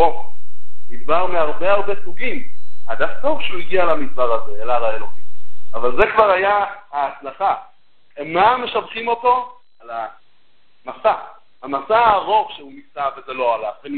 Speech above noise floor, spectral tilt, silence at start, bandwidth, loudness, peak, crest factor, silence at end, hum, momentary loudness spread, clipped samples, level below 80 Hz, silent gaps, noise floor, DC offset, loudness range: 49 dB; -7.5 dB/octave; 0 s; 4.5 kHz; -19 LUFS; 0 dBFS; 16 dB; 0 s; none; 18 LU; under 0.1%; -50 dBFS; none; -63 dBFS; under 0.1%; 4 LU